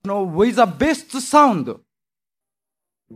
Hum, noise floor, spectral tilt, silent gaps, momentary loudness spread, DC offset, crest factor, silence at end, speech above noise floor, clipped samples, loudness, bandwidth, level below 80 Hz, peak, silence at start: none; under -90 dBFS; -5 dB/octave; none; 13 LU; under 0.1%; 18 dB; 0 s; over 73 dB; under 0.1%; -17 LUFS; 15.5 kHz; -50 dBFS; -2 dBFS; 0.05 s